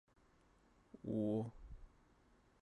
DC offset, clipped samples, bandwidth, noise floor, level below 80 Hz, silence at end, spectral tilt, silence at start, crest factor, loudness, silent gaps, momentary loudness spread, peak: under 0.1%; under 0.1%; 10.5 kHz; -72 dBFS; -64 dBFS; 0.75 s; -10 dB/octave; 0.95 s; 18 dB; -43 LUFS; none; 22 LU; -30 dBFS